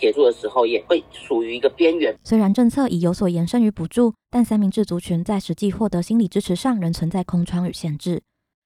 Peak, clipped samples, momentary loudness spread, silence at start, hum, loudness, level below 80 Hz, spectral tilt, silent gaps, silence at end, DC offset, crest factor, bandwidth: -4 dBFS; under 0.1%; 6 LU; 0 s; none; -20 LUFS; -48 dBFS; -7 dB/octave; none; 0.45 s; under 0.1%; 16 dB; 14.5 kHz